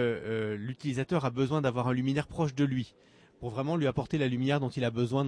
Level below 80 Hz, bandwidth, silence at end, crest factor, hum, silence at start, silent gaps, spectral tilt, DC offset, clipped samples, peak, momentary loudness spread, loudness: -58 dBFS; 10.5 kHz; 0 s; 14 dB; none; 0 s; none; -7.5 dB/octave; under 0.1%; under 0.1%; -16 dBFS; 6 LU; -31 LUFS